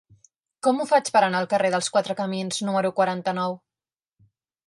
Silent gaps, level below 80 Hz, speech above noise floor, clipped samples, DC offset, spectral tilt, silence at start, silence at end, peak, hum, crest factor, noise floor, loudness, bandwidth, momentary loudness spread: none; -74 dBFS; over 67 dB; under 0.1%; under 0.1%; -4 dB/octave; 0.65 s; 1.1 s; -6 dBFS; none; 18 dB; under -90 dBFS; -23 LUFS; 11.5 kHz; 7 LU